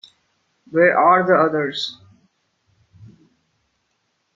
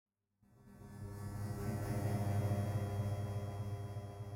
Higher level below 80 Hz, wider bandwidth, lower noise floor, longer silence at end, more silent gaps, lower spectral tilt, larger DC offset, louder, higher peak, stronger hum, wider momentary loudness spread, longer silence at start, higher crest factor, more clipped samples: second, -68 dBFS vs -58 dBFS; second, 7.6 kHz vs 16 kHz; about the same, -70 dBFS vs -72 dBFS; first, 2.45 s vs 0 s; neither; second, -6 dB/octave vs -7.5 dB/octave; neither; first, -17 LUFS vs -41 LUFS; first, -2 dBFS vs -26 dBFS; neither; about the same, 12 LU vs 12 LU; about the same, 0.7 s vs 0.6 s; first, 20 dB vs 14 dB; neither